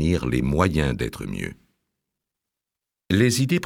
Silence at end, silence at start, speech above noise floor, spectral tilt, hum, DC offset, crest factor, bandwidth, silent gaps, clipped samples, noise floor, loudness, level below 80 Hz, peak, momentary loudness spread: 0 s; 0 s; 65 dB; -5.5 dB/octave; none; under 0.1%; 20 dB; 17 kHz; none; under 0.1%; -87 dBFS; -23 LUFS; -38 dBFS; -4 dBFS; 12 LU